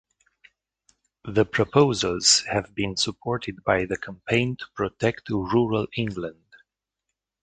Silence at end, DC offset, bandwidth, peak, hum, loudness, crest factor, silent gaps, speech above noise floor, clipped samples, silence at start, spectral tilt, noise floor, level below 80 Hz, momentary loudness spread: 1.15 s; under 0.1%; 9.4 kHz; -2 dBFS; none; -24 LUFS; 22 dB; none; 59 dB; under 0.1%; 1.25 s; -3.5 dB/octave; -84 dBFS; -52 dBFS; 11 LU